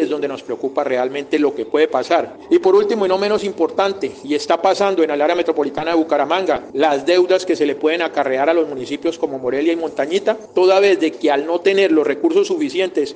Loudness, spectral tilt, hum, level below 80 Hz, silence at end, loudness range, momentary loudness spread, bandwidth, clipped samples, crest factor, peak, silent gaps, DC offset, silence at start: -17 LUFS; -4.5 dB/octave; none; -62 dBFS; 0 s; 2 LU; 7 LU; 9.2 kHz; under 0.1%; 14 dB; -2 dBFS; none; under 0.1%; 0 s